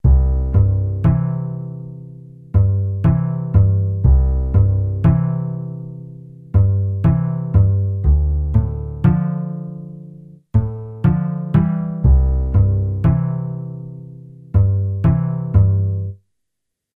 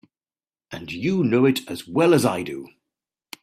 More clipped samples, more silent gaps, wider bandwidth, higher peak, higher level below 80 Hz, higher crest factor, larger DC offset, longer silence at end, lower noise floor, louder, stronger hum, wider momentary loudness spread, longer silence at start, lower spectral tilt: neither; neither; second, 2.9 kHz vs 15.5 kHz; about the same, -2 dBFS vs -2 dBFS; first, -22 dBFS vs -62 dBFS; second, 14 dB vs 20 dB; neither; about the same, 0.8 s vs 0.75 s; second, -78 dBFS vs under -90 dBFS; first, -18 LUFS vs -21 LUFS; neither; second, 16 LU vs 19 LU; second, 0.05 s vs 0.7 s; first, -12.5 dB/octave vs -6 dB/octave